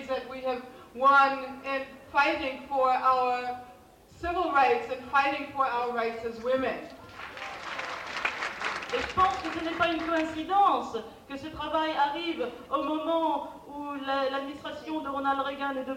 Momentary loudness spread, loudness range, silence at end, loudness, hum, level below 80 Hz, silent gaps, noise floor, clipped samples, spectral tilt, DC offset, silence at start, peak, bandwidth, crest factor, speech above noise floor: 14 LU; 5 LU; 0 s; -28 LUFS; none; -58 dBFS; none; -53 dBFS; under 0.1%; -4 dB/octave; under 0.1%; 0 s; -12 dBFS; 16.5 kHz; 16 dB; 25 dB